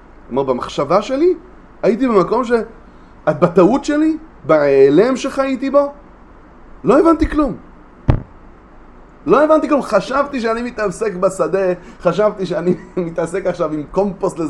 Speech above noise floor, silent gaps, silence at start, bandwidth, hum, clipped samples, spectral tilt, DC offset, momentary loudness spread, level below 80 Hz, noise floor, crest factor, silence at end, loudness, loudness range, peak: 26 dB; none; 0.3 s; 11.5 kHz; none; under 0.1%; -7 dB/octave; under 0.1%; 10 LU; -34 dBFS; -41 dBFS; 16 dB; 0 s; -16 LUFS; 4 LU; 0 dBFS